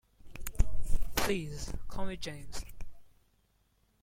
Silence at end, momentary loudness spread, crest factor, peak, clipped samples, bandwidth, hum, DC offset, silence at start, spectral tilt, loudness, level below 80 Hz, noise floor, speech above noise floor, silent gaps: 0.95 s; 18 LU; 20 dB; -10 dBFS; under 0.1%; 16.5 kHz; 50 Hz at -55 dBFS; under 0.1%; 0.25 s; -4 dB/octave; -38 LUFS; -38 dBFS; -71 dBFS; 38 dB; none